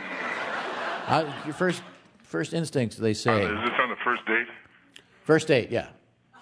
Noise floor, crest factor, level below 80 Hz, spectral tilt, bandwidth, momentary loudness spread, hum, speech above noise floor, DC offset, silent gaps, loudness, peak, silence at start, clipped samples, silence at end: -55 dBFS; 20 dB; -64 dBFS; -5 dB/octave; 11 kHz; 9 LU; none; 29 dB; under 0.1%; none; -27 LUFS; -6 dBFS; 0 s; under 0.1%; 0.5 s